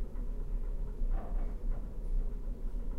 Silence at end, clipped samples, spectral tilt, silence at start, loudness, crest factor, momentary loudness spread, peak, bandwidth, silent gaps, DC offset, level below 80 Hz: 0 s; under 0.1%; -9 dB/octave; 0 s; -42 LUFS; 10 dB; 3 LU; -22 dBFS; 2.3 kHz; none; under 0.1%; -34 dBFS